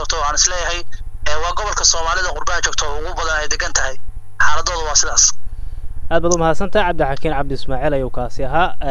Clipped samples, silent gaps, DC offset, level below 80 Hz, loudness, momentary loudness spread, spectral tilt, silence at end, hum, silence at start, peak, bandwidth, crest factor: under 0.1%; none; under 0.1%; -26 dBFS; -17 LUFS; 12 LU; -2 dB/octave; 0 s; none; 0 s; 0 dBFS; 10 kHz; 14 dB